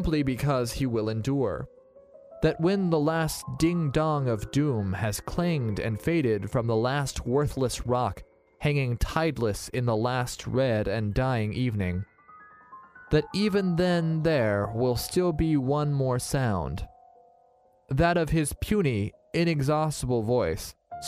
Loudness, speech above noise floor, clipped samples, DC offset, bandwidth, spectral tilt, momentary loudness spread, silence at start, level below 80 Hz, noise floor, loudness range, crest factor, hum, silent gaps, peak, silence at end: -27 LUFS; 36 dB; under 0.1%; under 0.1%; 15.5 kHz; -6 dB/octave; 6 LU; 0 s; -44 dBFS; -62 dBFS; 2 LU; 18 dB; none; none; -8 dBFS; 0 s